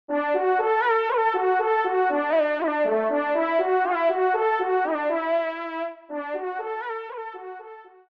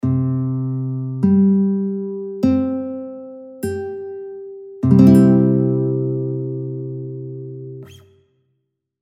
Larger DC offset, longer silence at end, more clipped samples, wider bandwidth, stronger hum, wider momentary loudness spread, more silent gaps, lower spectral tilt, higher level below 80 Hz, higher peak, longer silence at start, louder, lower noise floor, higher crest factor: neither; second, 0.3 s vs 1.05 s; neither; second, 5.6 kHz vs 13.5 kHz; neither; second, 12 LU vs 21 LU; neither; second, -6 dB/octave vs -10 dB/octave; second, -78 dBFS vs -52 dBFS; second, -12 dBFS vs 0 dBFS; about the same, 0.1 s vs 0.05 s; second, -24 LUFS vs -18 LUFS; second, -44 dBFS vs -72 dBFS; second, 12 dB vs 18 dB